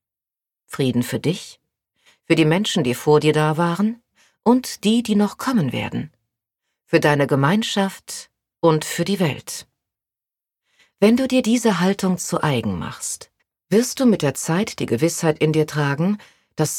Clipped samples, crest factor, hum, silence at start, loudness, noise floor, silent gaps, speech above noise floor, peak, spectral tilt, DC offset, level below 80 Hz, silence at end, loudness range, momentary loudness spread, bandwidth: under 0.1%; 20 dB; none; 0.7 s; -20 LUFS; -89 dBFS; none; 70 dB; -2 dBFS; -5.5 dB/octave; under 0.1%; -58 dBFS; 0 s; 3 LU; 13 LU; 17.5 kHz